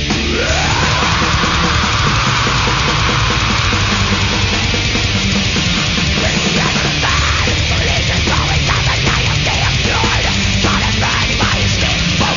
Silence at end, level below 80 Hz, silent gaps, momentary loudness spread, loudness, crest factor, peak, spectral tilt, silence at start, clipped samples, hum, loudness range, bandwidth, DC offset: 0 s; -22 dBFS; none; 1 LU; -13 LUFS; 12 dB; -2 dBFS; -3.5 dB/octave; 0 s; under 0.1%; none; 1 LU; 7.4 kHz; under 0.1%